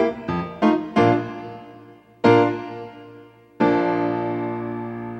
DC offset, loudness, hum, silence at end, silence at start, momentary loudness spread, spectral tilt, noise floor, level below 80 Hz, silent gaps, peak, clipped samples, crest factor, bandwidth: under 0.1%; -21 LUFS; none; 0 s; 0 s; 19 LU; -8 dB/octave; -46 dBFS; -56 dBFS; none; -2 dBFS; under 0.1%; 20 dB; 8.2 kHz